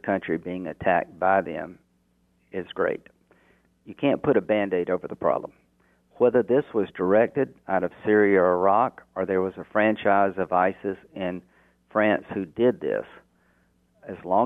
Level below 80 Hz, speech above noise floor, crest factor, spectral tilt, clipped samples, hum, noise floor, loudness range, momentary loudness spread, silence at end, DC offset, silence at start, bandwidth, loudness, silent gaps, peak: -64 dBFS; 43 dB; 18 dB; -9 dB/octave; under 0.1%; none; -66 dBFS; 6 LU; 13 LU; 0 s; under 0.1%; 0.05 s; 3.9 kHz; -24 LUFS; none; -6 dBFS